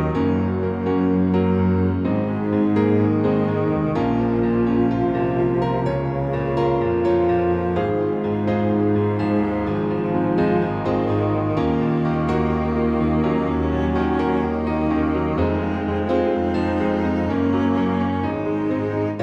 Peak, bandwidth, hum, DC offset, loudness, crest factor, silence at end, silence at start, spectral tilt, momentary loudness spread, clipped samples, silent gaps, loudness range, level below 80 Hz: -6 dBFS; 7.6 kHz; none; under 0.1%; -21 LUFS; 14 dB; 0 s; 0 s; -9.5 dB/octave; 4 LU; under 0.1%; none; 1 LU; -38 dBFS